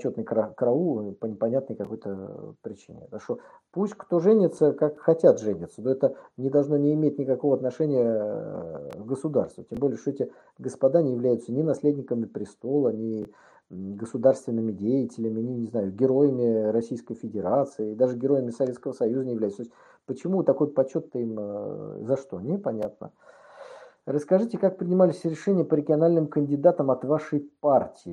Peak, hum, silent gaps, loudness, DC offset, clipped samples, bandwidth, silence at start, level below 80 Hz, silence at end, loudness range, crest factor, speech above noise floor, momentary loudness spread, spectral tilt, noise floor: -4 dBFS; none; none; -26 LUFS; under 0.1%; under 0.1%; 10 kHz; 0 s; -70 dBFS; 0 s; 6 LU; 20 dB; 21 dB; 14 LU; -9 dB/octave; -46 dBFS